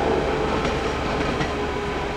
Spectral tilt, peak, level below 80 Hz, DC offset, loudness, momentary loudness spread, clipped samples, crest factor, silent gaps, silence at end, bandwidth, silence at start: -5.5 dB/octave; -10 dBFS; -34 dBFS; under 0.1%; -24 LUFS; 3 LU; under 0.1%; 14 dB; none; 0 s; 14 kHz; 0 s